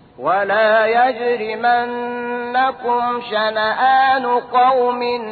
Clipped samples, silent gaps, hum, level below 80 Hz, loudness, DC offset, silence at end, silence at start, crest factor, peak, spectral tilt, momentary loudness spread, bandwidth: under 0.1%; none; none; -62 dBFS; -17 LUFS; under 0.1%; 0 s; 0.2 s; 12 dB; -4 dBFS; -6.5 dB/octave; 7 LU; 4.7 kHz